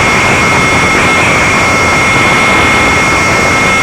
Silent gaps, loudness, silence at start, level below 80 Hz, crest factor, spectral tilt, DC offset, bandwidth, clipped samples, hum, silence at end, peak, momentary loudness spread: none; -6 LUFS; 0 s; -28 dBFS; 8 dB; -3.5 dB/octave; under 0.1%; 17 kHz; under 0.1%; none; 0 s; 0 dBFS; 1 LU